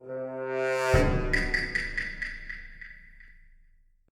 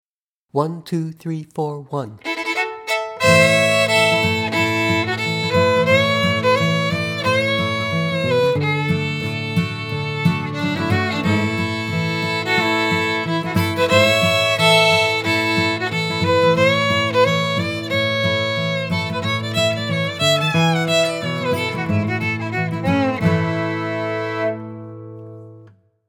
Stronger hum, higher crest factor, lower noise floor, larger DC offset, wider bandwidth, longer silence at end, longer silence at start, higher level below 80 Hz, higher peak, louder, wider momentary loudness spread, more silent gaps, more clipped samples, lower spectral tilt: neither; about the same, 22 dB vs 18 dB; second, -60 dBFS vs -76 dBFS; neither; second, 15.5 kHz vs 18 kHz; first, 0.8 s vs 0.4 s; second, 0 s vs 0.55 s; first, -36 dBFS vs -54 dBFS; second, -10 dBFS vs 0 dBFS; second, -28 LUFS vs -18 LUFS; first, 20 LU vs 10 LU; neither; neither; about the same, -5.5 dB/octave vs -5 dB/octave